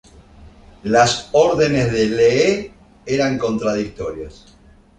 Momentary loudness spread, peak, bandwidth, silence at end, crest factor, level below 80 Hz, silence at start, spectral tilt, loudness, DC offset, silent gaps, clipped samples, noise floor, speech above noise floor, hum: 17 LU; -2 dBFS; 9.6 kHz; 0.65 s; 16 dB; -44 dBFS; 0.4 s; -5 dB/octave; -17 LUFS; under 0.1%; none; under 0.1%; -44 dBFS; 27 dB; none